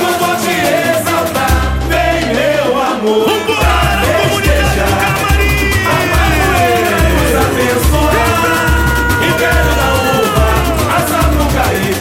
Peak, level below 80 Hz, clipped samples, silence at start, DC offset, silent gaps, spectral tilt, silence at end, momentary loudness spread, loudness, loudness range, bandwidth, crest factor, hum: 0 dBFS; -18 dBFS; under 0.1%; 0 s; under 0.1%; none; -4.5 dB/octave; 0 s; 2 LU; -12 LUFS; 1 LU; 17 kHz; 10 dB; none